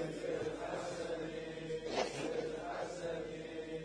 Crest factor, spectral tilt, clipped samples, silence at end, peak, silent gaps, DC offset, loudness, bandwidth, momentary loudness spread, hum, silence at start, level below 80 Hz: 20 dB; -4.5 dB/octave; under 0.1%; 0 s; -22 dBFS; none; under 0.1%; -41 LUFS; 10.5 kHz; 6 LU; none; 0 s; -64 dBFS